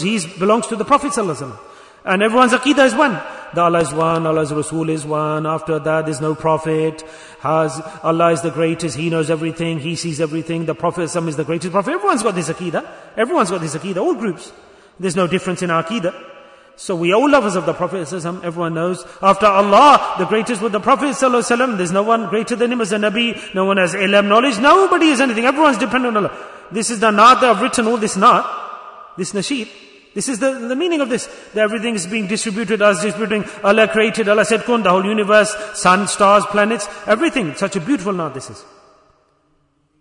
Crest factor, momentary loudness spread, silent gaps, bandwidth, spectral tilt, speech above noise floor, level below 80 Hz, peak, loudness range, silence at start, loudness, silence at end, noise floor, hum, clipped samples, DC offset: 16 dB; 12 LU; none; 11 kHz; -4.5 dB/octave; 45 dB; -54 dBFS; 0 dBFS; 6 LU; 0 s; -16 LUFS; 1.4 s; -61 dBFS; none; under 0.1%; under 0.1%